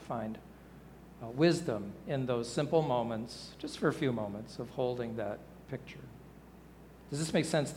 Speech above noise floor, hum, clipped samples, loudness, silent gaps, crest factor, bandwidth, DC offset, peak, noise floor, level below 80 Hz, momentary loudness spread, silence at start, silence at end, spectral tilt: 20 dB; none; under 0.1%; -35 LUFS; none; 22 dB; 18.5 kHz; under 0.1%; -14 dBFS; -54 dBFS; -62 dBFS; 24 LU; 0 s; 0 s; -6 dB/octave